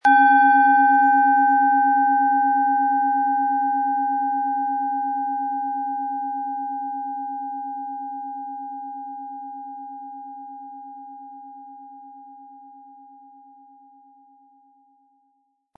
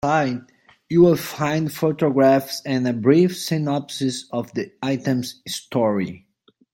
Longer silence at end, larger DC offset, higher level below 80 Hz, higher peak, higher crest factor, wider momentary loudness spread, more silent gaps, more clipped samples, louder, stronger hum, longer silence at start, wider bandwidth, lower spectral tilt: first, 3 s vs 0.55 s; neither; second, -88 dBFS vs -60 dBFS; about the same, -6 dBFS vs -4 dBFS; about the same, 16 dB vs 18 dB; first, 24 LU vs 11 LU; neither; neither; about the same, -20 LUFS vs -21 LUFS; neither; about the same, 0.05 s vs 0.05 s; second, 4.8 kHz vs 17 kHz; second, -4 dB/octave vs -6 dB/octave